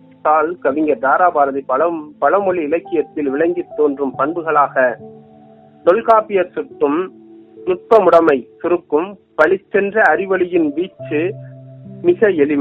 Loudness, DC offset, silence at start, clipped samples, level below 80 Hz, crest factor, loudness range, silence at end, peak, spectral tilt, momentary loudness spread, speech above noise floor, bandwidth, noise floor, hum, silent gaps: -16 LUFS; under 0.1%; 0.25 s; under 0.1%; -60 dBFS; 16 dB; 3 LU; 0 s; 0 dBFS; -4.5 dB/octave; 9 LU; 29 dB; 6.2 kHz; -44 dBFS; none; none